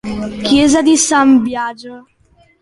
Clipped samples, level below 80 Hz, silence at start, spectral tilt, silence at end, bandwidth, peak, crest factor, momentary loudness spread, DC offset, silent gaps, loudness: under 0.1%; -42 dBFS; 0.05 s; -3 dB/octave; 0.6 s; 11.5 kHz; -2 dBFS; 12 dB; 13 LU; under 0.1%; none; -12 LUFS